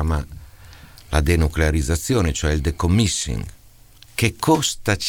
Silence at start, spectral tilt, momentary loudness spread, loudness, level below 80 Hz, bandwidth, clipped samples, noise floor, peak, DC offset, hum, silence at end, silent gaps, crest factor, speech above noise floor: 0 s; -4.5 dB/octave; 9 LU; -20 LUFS; -28 dBFS; 17 kHz; under 0.1%; -48 dBFS; -2 dBFS; 0.2%; none; 0 s; none; 18 dB; 28 dB